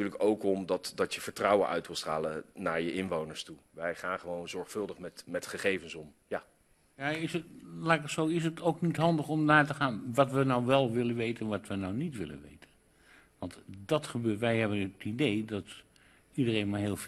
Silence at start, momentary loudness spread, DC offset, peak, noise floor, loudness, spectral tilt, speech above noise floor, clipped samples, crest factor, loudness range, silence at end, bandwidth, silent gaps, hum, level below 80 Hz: 0 s; 14 LU; under 0.1%; -8 dBFS; -63 dBFS; -32 LUFS; -5.5 dB/octave; 31 dB; under 0.1%; 24 dB; 9 LU; 0 s; 13.5 kHz; none; none; -66 dBFS